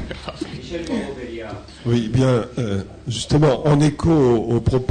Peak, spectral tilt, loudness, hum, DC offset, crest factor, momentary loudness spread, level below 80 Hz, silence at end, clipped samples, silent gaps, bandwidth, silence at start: -8 dBFS; -7 dB/octave; -19 LUFS; none; under 0.1%; 12 dB; 15 LU; -38 dBFS; 0 s; under 0.1%; none; 9.6 kHz; 0 s